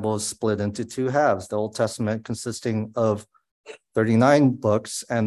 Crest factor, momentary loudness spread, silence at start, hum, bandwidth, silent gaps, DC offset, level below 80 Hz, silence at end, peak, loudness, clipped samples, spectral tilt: 20 dB; 11 LU; 0 s; none; 12.5 kHz; 3.51-3.64 s; under 0.1%; -56 dBFS; 0 s; -4 dBFS; -23 LUFS; under 0.1%; -6 dB/octave